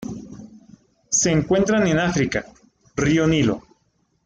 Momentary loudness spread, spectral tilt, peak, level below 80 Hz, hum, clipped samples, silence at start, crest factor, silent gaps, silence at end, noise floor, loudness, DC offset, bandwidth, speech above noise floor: 15 LU; -4.5 dB/octave; -6 dBFS; -46 dBFS; none; under 0.1%; 0 s; 14 dB; none; 0.65 s; -66 dBFS; -20 LUFS; under 0.1%; 10 kHz; 47 dB